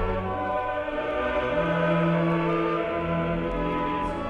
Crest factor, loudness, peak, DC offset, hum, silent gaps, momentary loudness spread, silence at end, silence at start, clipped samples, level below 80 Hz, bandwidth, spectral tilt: 14 dB; -26 LUFS; -12 dBFS; under 0.1%; none; none; 5 LU; 0 s; 0 s; under 0.1%; -40 dBFS; 6.6 kHz; -8 dB/octave